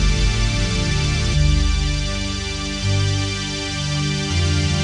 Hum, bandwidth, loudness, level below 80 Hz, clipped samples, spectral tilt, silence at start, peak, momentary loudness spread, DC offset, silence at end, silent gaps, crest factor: 50 Hz at -30 dBFS; 11 kHz; -20 LUFS; -24 dBFS; under 0.1%; -4.5 dB/octave; 0 s; -6 dBFS; 5 LU; under 0.1%; 0 s; none; 14 dB